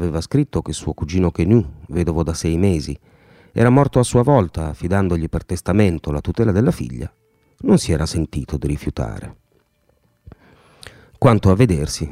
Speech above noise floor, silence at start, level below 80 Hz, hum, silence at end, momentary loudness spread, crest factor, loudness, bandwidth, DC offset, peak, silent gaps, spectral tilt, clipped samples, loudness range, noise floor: 44 dB; 0 s; -34 dBFS; none; 0 s; 12 LU; 18 dB; -18 LUFS; 14.5 kHz; under 0.1%; 0 dBFS; none; -7 dB/octave; under 0.1%; 5 LU; -61 dBFS